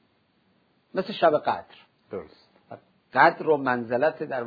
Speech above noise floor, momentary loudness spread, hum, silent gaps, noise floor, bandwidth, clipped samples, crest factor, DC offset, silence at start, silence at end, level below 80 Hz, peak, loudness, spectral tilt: 43 dB; 19 LU; none; none; -67 dBFS; 5 kHz; under 0.1%; 24 dB; under 0.1%; 0.95 s; 0 s; -70 dBFS; -4 dBFS; -24 LUFS; -7.5 dB/octave